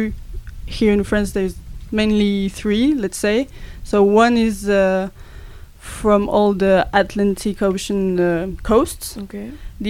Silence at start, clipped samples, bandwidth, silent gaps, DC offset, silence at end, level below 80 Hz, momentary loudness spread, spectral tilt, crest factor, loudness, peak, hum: 0 s; under 0.1%; 15.5 kHz; none; under 0.1%; 0 s; -34 dBFS; 17 LU; -5.5 dB/octave; 16 dB; -18 LUFS; -2 dBFS; none